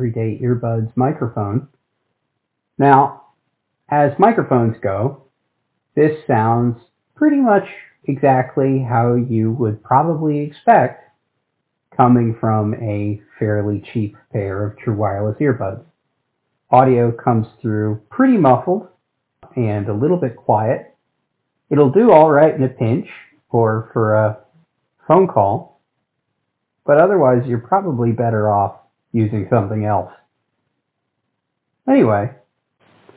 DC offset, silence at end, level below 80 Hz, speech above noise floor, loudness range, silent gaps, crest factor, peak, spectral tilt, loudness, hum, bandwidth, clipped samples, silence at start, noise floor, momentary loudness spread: under 0.1%; 0.85 s; -50 dBFS; 59 dB; 6 LU; none; 18 dB; 0 dBFS; -12.5 dB/octave; -16 LUFS; none; 4 kHz; under 0.1%; 0 s; -74 dBFS; 11 LU